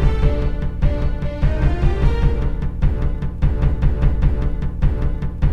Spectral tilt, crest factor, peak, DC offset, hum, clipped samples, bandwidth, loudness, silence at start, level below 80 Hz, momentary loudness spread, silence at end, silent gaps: -9 dB/octave; 14 dB; -2 dBFS; 3%; none; under 0.1%; 5.8 kHz; -21 LUFS; 0 s; -18 dBFS; 5 LU; 0 s; none